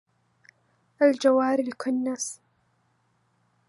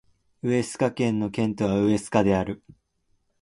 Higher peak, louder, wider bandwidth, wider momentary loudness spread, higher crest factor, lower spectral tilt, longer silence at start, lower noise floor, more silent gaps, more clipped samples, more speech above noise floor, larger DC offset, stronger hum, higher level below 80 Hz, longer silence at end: about the same, -8 dBFS vs -6 dBFS; about the same, -24 LUFS vs -25 LUFS; about the same, 11.5 kHz vs 11.5 kHz; first, 12 LU vs 8 LU; about the same, 20 dB vs 18 dB; second, -3 dB/octave vs -6.5 dB/octave; first, 1 s vs 0.45 s; about the same, -69 dBFS vs -70 dBFS; neither; neither; about the same, 46 dB vs 46 dB; neither; neither; second, -82 dBFS vs -52 dBFS; first, 1.35 s vs 0.85 s